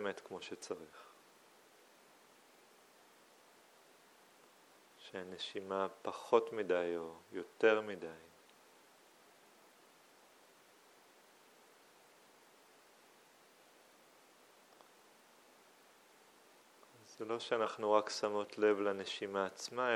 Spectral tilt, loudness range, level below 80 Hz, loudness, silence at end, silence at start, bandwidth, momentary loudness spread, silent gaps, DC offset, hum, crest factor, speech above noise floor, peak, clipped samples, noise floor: -3.5 dB/octave; 19 LU; under -90 dBFS; -38 LUFS; 0 s; 0 s; 16 kHz; 20 LU; none; under 0.1%; none; 26 dB; 28 dB; -16 dBFS; under 0.1%; -65 dBFS